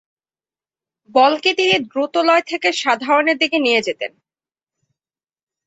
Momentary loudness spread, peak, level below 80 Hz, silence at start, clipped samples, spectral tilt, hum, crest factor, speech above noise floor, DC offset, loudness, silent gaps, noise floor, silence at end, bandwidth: 6 LU; -2 dBFS; -68 dBFS; 1.15 s; under 0.1%; -2.5 dB/octave; none; 18 dB; over 73 dB; under 0.1%; -16 LUFS; none; under -90 dBFS; 1.6 s; 8.4 kHz